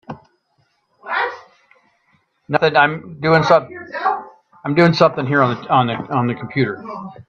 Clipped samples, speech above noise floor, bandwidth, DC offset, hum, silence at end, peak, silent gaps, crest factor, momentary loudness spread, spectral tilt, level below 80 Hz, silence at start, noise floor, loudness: under 0.1%; 48 dB; 7.2 kHz; under 0.1%; none; 0.05 s; 0 dBFS; none; 18 dB; 16 LU; -7 dB/octave; -58 dBFS; 0.1 s; -64 dBFS; -17 LUFS